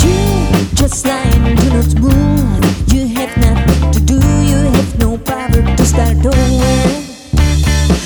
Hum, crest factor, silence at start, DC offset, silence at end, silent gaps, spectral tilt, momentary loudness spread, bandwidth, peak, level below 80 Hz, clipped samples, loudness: none; 10 dB; 0 s; under 0.1%; 0 s; none; -6 dB/octave; 4 LU; over 20 kHz; 0 dBFS; -14 dBFS; under 0.1%; -12 LUFS